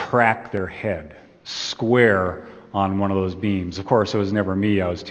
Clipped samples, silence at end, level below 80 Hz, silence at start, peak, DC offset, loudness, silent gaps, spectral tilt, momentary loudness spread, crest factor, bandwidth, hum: under 0.1%; 0 s; -52 dBFS; 0 s; -2 dBFS; under 0.1%; -21 LUFS; none; -6 dB/octave; 12 LU; 20 dB; 8.6 kHz; none